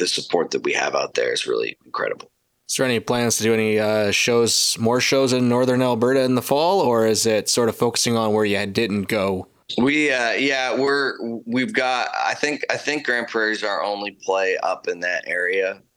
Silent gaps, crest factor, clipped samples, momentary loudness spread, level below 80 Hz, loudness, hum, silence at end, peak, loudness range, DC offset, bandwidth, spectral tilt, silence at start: none; 18 dB; under 0.1%; 7 LU; -62 dBFS; -20 LUFS; none; 0.2 s; -2 dBFS; 4 LU; under 0.1%; 19 kHz; -3.5 dB/octave; 0 s